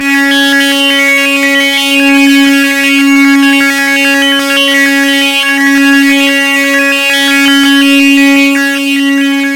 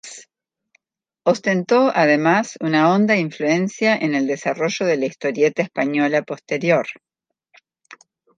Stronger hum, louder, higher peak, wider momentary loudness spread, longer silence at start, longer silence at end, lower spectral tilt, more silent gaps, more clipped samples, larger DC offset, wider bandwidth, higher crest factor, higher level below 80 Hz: neither; first, -6 LUFS vs -19 LUFS; about the same, 0 dBFS vs -2 dBFS; second, 2 LU vs 7 LU; about the same, 0 s vs 0.05 s; second, 0 s vs 1.45 s; second, -0.5 dB/octave vs -5.5 dB/octave; neither; first, 0.3% vs under 0.1%; neither; first, 17.5 kHz vs 9.4 kHz; second, 6 dB vs 18 dB; first, -54 dBFS vs -72 dBFS